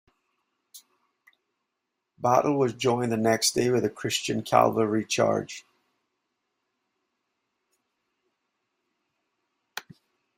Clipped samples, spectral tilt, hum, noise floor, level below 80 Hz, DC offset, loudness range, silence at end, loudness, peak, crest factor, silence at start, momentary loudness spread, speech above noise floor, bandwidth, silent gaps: under 0.1%; -4 dB/octave; none; -82 dBFS; -68 dBFS; under 0.1%; 7 LU; 0.6 s; -25 LUFS; -4 dBFS; 24 dB; 0.75 s; 19 LU; 58 dB; 16 kHz; none